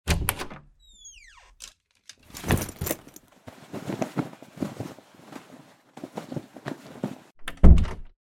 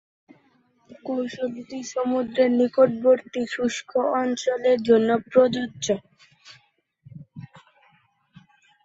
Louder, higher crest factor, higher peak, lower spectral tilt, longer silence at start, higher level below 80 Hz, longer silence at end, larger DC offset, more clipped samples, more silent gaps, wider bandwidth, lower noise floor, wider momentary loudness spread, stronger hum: second, -28 LUFS vs -23 LUFS; first, 26 dB vs 20 dB; first, 0 dBFS vs -4 dBFS; about the same, -5.5 dB/octave vs -5 dB/octave; second, 0.05 s vs 0.9 s; first, -28 dBFS vs -68 dBFS; second, 0.15 s vs 1.25 s; neither; neither; neither; first, 17.5 kHz vs 8 kHz; second, -54 dBFS vs -63 dBFS; first, 26 LU vs 14 LU; neither